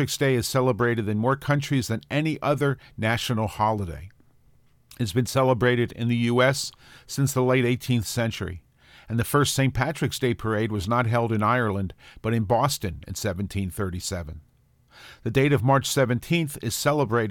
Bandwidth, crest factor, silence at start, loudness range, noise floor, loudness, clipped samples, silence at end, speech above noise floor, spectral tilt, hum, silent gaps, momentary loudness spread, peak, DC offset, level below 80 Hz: 17.5 kHz; 18 dB; 0 s; 4 LU; -59 dBFS; -24 LUFS; under 0.1%; 0 s; 35 dB; -5.5 dB/octave; none; none; 10 LU; -6 dBFS; under 0.1%; -48 dBFS